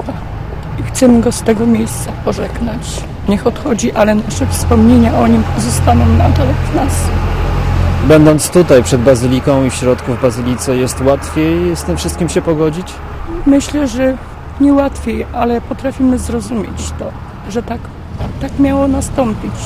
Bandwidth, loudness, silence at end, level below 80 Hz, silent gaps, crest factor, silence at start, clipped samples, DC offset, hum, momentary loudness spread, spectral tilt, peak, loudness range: 15.5 kHz; -13 LUFS; 0 s; -22 dBFS; none; 12 dB; 0 s; 0.3%; under 0.1%; none; 14 LU; -6 dB/octave; 0 dBFS; 7 LU